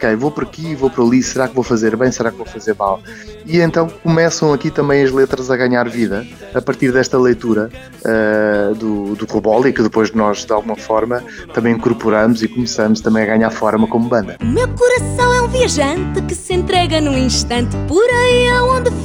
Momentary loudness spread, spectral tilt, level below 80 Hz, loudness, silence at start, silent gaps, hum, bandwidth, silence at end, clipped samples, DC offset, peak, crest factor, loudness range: 7 LU; -5 dB/octave; -32 dBFS; -15 LUFS; 0 s; none; none; 16 kHz; 0 s; under 0.1%; under 0.1%; 0 dBFS; 14 dB; 2 LU